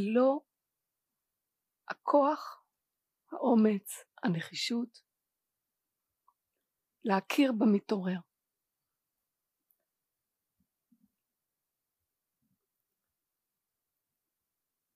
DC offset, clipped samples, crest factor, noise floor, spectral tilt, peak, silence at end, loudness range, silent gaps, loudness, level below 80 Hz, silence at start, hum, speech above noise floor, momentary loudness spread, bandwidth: under 0.1%; under 0.1%; 22 dB; -89 dBFS; -6 dB/octave; -14 dBFS; 6.75 s; 7 LU; none; -31 LUFS; under -90 dBFS; 0 s; none; 59 dB; 15 LU; 15.5 kHz